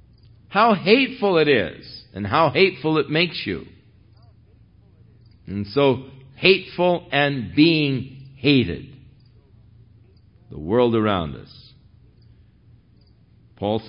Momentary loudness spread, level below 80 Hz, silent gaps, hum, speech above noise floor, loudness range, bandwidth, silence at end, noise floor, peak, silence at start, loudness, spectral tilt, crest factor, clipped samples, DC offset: 16 LU; -52 dBFS; none; none; 34 dB; 7 LU; 5.4 kHz; 0 s; -54 dBFS; -2 dBFS; 0.5 s; -20 LUFS; -10.5 dB/octave; 20 dB; under 0.1%; under 0.1%